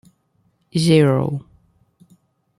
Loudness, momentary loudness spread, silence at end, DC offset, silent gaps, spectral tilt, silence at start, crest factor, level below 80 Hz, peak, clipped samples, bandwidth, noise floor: -18 LUFS; 12 LU; 1.2 s; under 0.1%; none; -6.5 dB/octave; 0.75 s; 18 dB; -56 dBFS; -2 dBFS; under 0.1%; 13 kHz; -64 dBFS